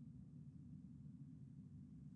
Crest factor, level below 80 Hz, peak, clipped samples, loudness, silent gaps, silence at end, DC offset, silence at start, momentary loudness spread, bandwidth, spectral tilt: 10 dB; -74 dBFS; -48 dBFS; under 0.1%; -59 LUFS; none; 0 s; under 0.1%; 0 s; 1 LU; 8.2 kHz; -10 dB/octave